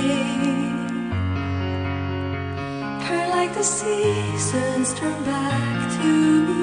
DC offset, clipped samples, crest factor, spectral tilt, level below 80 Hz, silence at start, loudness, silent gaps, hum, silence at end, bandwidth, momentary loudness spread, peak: under 0.1%; under 0.1%; 14 dB; -5 dB/octave; -52 dBFS; 0 s; -23 LUFS; none; none; 0 s; 10 kHz; 8 LU; -8 dBFS